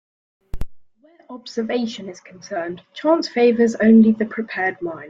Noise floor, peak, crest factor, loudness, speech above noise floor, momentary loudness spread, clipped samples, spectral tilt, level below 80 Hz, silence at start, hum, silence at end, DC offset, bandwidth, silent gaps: -51 dBFS; -4 dBFS; 16 dB; -18 LUFS; 32 dB; 24 LU; under 0.1%; -6.5 dB/octave; -44 dBFS; 0.55 s; none; 0 s; under 0.1%; 7.6 kHz; none